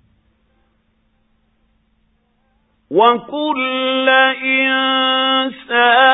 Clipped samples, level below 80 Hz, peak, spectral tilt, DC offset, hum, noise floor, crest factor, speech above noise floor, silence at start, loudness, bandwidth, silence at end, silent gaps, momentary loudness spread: under 0.1%; -64 dBFS; 0 dBFS; -6.5 dB/octave; under 0.1%; none; -61 dBFS; 16 dB; 47 dB; 2.9 s; -14 LUFS; 4 kHz; 0 s; none; 7 LU